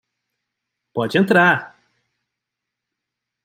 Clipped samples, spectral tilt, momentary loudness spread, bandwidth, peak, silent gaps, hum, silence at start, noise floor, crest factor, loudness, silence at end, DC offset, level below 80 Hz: under 0.1%; -6.5 dB/octave; 12 LU; 16 kHz; -2 dBFS; none; none; 0.95 s; -82 dBFS; 20 dB; -17 LUFS; 1.75 s; under 0.1%; -68 dBFS